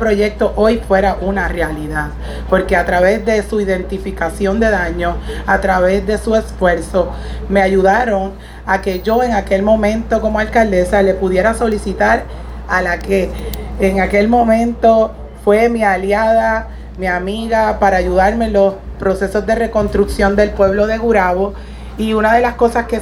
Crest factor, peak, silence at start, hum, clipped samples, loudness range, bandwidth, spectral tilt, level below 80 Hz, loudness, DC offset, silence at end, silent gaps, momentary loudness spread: 14 dB; 0 dBFS; 0 s; none; under 0.1%; 2 LU; 16.5 kHz; -6 dB/octave; -26 dBFS; -14 LUFS; under 0.1%; 0 s; none; 9 LU